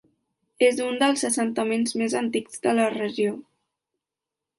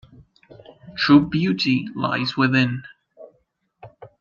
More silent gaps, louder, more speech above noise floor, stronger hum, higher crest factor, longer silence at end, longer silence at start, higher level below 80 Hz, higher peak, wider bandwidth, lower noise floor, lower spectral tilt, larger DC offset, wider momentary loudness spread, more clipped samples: neither; second, -24 LUFS vs -19 LUFS; first, 64 dB vs 48 dB; neither; about the same, 18 dB vs 20 dB; first, 1.15 s vs 0.15 s; second, 0.6 s vs 0.85 s; second, -74 dBFS vs -56 dBFS; second, -8 dBFS vs -2 dBFS; first, 11.5 kHz vs 7.2 kHz; first, -87 dBFS vs -67 dBFS; second, -3.5 dB/octave vs -6.5 dB/octave; neither; second, 6 LU vs 9 LU; neither